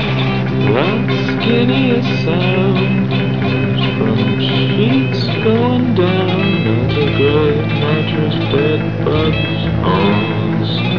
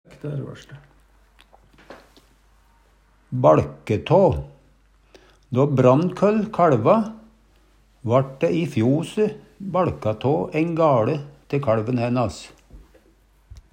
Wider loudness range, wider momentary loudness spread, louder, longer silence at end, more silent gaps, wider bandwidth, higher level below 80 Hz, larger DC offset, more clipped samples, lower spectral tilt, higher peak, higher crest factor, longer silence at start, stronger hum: second, 1 LU vs 5 LU; second, 3 LU vs 15 LU; first, -14 LUFS vs -21 LUFS; second, 0 s vs 0.2 s; neither; second, 5.4 kHz vs 10.5 kHz; first, -36 dBFS vs -50 dBFS; first, 2% vs under 0.1%; neither; about the same, -8.5 dB/octave vs -8 dB/octave; about the same, 0 dBFS vs -2 dBFS; second, 14 dB vs 20 dB; second, 0 s vs 0.25 s; neither